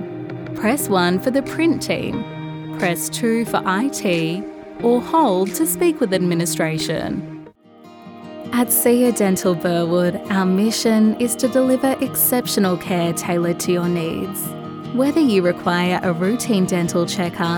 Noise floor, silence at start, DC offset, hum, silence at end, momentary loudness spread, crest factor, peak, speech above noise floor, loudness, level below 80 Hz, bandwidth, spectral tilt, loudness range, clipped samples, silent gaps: -44 dBFS; 0 s; under 0.1%; none; 0 s; 11 LU; 16 dB; -4 dBFS; 26 dB; -19 LUFS; -54 dBFS; 19 kHz; -5 dB/octave; 3 LU; under 0.1%; none